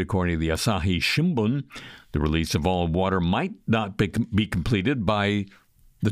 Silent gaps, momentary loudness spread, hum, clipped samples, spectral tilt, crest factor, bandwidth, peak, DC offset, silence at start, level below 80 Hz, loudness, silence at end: none; 7 LU; none; under 0.1%; -6 dB/octave; 16 dB; 15.5 kHz; -8 dBFS; under 0.1%; 0 s; -40 dBFS; -24 LUFS; 0 s